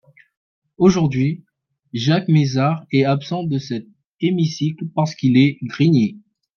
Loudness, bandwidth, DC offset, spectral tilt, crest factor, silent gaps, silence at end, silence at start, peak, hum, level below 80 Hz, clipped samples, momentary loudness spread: -18 LUFS; 7 kHz; under 0.1%; -7 dB/octave; 16 dB; 4.06-4.13 s; 0.4 s; 0.8 s; -2 dBFS; none; -54 dBFS; under 0.1%; 9 LU